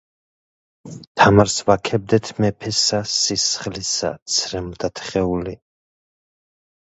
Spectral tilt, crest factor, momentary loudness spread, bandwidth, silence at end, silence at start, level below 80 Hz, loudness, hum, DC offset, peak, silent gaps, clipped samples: -3.5 dB/octave; 20 dB; 12 LU; 8.2 kHz; 1.3 s; 0.85 s; -44 dBFS; -19 LUFS; none; under 0.1%; 0 dBFS; 1.07-1.15 s, 4.22-4.26 s; under 0.1%